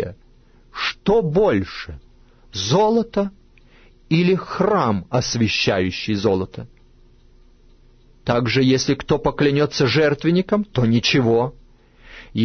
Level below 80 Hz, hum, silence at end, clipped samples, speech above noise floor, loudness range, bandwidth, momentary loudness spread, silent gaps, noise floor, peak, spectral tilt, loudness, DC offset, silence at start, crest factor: -44 dBFS; none; 0 s; under 0.1%; 32 dB; 4 LU; 6.6 kHz; 13 LU; none; -50 dBFS; -4 dBFS; -5.5 dB/octave; -19 LUFS; under 0.1%; 0 s; 16 dB